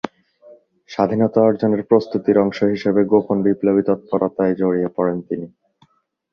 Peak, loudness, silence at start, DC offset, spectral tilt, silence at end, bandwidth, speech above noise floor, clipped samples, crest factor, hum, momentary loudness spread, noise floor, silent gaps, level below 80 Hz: -2 dBFS; -18 LUFS; 0.05 s; under 0.1%; -9 dB/octave; 0.85 s; 6.8 kHz; 42 dB; under 0.1%; 16 dB; none; 10 LU; -59 dBFS; none; -58 dBFS